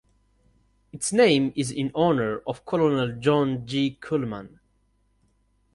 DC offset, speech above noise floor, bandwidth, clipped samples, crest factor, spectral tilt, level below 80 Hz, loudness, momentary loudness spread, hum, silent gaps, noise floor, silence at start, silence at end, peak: under 0.1%; 43 dB; 11.5 kHz; under 0.1%; 20 dB; -5 dB/octave; -58 dBFS; -24 LUFS; 10 LU; 50 Hz at -55 dBFS; none; -67 dBFS; 0.95 s; 1.25 s; -6 dBFS